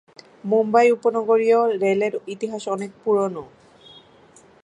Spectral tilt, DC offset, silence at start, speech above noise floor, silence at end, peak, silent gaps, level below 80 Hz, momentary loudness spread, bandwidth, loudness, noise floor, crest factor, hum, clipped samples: -6 dB/octave; under 0.1%; 0.45 s; 32 dB; 1.2 s; -4 dBFS; none; -70 dBFS; 12 LU; 11 kHz; -20 LUFS; -51 dBFS; 18 dB; none; under 0.1%